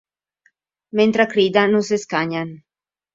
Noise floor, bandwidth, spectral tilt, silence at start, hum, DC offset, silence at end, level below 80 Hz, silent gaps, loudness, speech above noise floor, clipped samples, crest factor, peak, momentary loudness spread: -64 dBFS; 7.8 kHz; -5 dB/octave; 0.95 s; none; under 0.1%; 0.6 s; -64 dBFS; none; -18 LUFS; 46 dB; under 0.1%; 20 dB; 0 dBFS; 10 LU